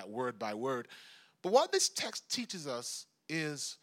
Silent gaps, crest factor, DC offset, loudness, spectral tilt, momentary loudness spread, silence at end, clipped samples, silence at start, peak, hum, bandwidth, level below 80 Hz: none; 22 dB; under 0.1%; -35 LUFS; -2.5 dB/octave; 13 LU; 0.05 s; under 0.1%; 0 s; -14 dBFS; none; 16.5 kHz; under -90 dBFS